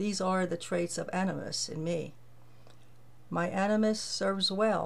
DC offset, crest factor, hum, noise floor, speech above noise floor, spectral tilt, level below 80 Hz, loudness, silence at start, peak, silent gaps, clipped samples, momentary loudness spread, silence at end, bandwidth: 0.4%; 16 dB; none; -59 dBFS; 28 dB; -4.5 dB/octave; -68 dBFS; -31 LUFS; 0 s; -16 dBFS; none; under 0.1%; 7 LU; 0 s; 13.5 kHz